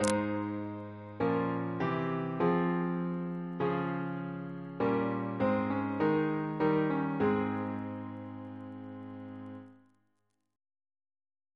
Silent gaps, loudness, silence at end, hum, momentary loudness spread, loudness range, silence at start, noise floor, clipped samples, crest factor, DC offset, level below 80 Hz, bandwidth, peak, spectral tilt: none; -33 LUFS; 1.8 s; none; 15 LU; 13 LU; 0 s; -81 dBFS; under 0.1%; 24 dB; under 0.1%; -68 dBFS; 11 kHz; -10 dBFS; -7 dB/octave